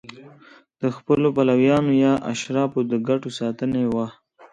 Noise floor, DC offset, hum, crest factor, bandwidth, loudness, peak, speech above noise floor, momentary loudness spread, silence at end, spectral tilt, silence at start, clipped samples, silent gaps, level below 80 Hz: -50 dBFS; under 0.1%; none; 16 dB; 9.2 kHz; -21 LUFS; -6 dBFS; 30 dB; 10 LU; 0.05 s; -6.5 dB/octave; 0.1 s; under 0.1%; none; -58 dBFS